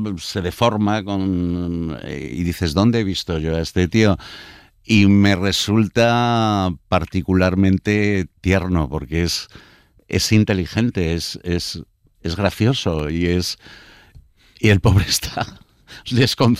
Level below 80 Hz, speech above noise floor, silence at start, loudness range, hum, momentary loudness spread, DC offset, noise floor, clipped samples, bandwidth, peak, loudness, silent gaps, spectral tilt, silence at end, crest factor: -38 dBFS; 30 dB; 0 s; 4 LU; none; 10 LU; under 0.1%; -48 dBFS; under 0.1%; 15.5 kHz; -4 dBFS; -19 LUFS; none; -5.5 dB/octave; 0 s; 16 dB